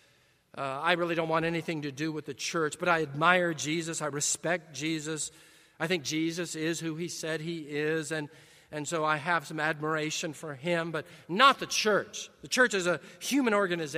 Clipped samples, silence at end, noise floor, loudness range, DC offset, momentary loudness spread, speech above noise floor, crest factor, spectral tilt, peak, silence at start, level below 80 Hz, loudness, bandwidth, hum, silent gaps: under 0.1%; 0 s; -65 dBFS; 5 LU; under 0.1%; 11 LU; 35 dB; 24 dB; -3.5 dB/octave; -6 dBFS; 0.55 s; -72 dBFS; -30 LUFS; 15.5 kHz; none; none